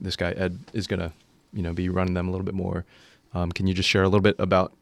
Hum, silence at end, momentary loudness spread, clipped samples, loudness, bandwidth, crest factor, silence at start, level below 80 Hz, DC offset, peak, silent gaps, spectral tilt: none; 0.15 s; 14 LU; under 0.1%; -25 LUFS; 12.5 kHz; 20 dB; 0 s; -52 dBFS; under 0.1%; -6 dBFS; none; -6 dB/octave